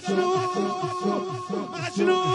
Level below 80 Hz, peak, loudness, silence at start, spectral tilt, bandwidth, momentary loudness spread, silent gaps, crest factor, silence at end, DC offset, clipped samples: -70 dBFS; -10 dBFS; -26 LUFS; 0 s; -5.5 dB/octave; 11 kHz; 8 LU; none; 14 dB; 0 s; under 0.1%; under 0.1%